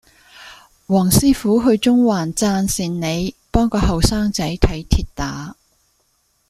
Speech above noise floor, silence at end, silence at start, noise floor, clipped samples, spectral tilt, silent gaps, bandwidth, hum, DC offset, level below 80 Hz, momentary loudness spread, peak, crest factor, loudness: 47 dB; 0.95 s; 0.4 s; -63 dBFS; under 0.1%; -5 dB/octave; none; 15.5 kHz; none; under 0.1%; -28 dBFS; 10 LU; 0 dBFS; 18 dB; -18 LUFS